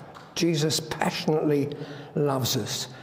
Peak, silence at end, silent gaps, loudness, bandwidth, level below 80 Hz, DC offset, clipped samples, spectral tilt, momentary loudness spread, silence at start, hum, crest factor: -6 dBFS; 0 s; none; -26 LUFS; 16 kHz; -62 dBFS; under 0.1%; under 0.1%; -4.5 dB/octave; 9 LU; 0 s; none; 20 dB